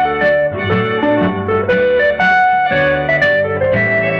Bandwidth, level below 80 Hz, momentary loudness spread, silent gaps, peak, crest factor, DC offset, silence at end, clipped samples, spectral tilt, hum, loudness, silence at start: 7 kHz; -42 dBFS; 4 LU; none; -2 dBFS; 12 dB; under 0.1%; 0 s; under 0.1%; -7.5 dB/octave; none; -13 LUFS; 0 s